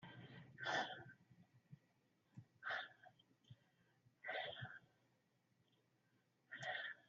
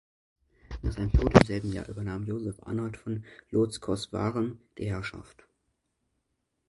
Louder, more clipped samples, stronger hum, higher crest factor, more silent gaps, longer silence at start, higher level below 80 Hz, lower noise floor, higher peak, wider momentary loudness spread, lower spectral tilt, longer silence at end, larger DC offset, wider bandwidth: second, -49 LUFS vs -30 LUFS; neither; neither; second, 22 dB vs 30 dB; neither; second, 0 s vs 0.7 s; second, under -90 dBFS vs -38 dBFS; about the same, -82 dBFS vs -79 dBFS; second, -32 dBFS vs 0 dBFS; first, 24 LU vs 16 LU; second, -1 dB/octave vs -7 dB/octave; second, 0.05 s vs 1.45 s; neither; second, 7 kHz vs 11.5 kHz